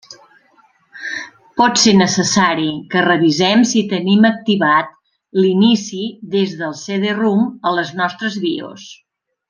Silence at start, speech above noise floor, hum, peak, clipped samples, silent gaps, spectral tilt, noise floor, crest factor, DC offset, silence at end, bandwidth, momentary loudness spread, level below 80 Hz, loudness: 0.1 s; 39 dB; none; 0 dBFS; under 0.1%; none; -4 dB/octave; -54 dBFS; 16 dB; under 0.1%; 0.55 s; 10 kHz; 13 LU; -60 dBFS; -15 LUFS